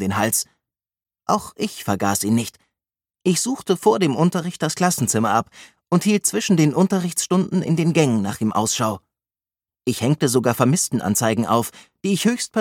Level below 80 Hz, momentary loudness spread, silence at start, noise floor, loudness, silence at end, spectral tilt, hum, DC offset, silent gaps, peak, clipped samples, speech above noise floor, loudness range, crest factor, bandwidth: -60 dBFS; 8 LU; 0 s; under -90 dBFS; -20 LUFS; 0 s; -5 dB/octave; none; under 0.1%; none; 0 dBFS; under 0.1%; over 70 dB; 3 LU; 20 dB; 17.5 kHz